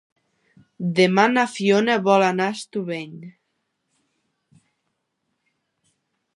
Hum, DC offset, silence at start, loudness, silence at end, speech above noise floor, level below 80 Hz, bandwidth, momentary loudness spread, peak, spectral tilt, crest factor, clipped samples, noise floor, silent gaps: none; under 0.1%; 0.8 s; -20 LUFS; 3.05 s; 56 dB; -76 dBFS; 11.5 kHz; 14 LU; -2 dBFS; -5.5 dB/octave; 22 dB; under 0.1%; -76 dBFS; none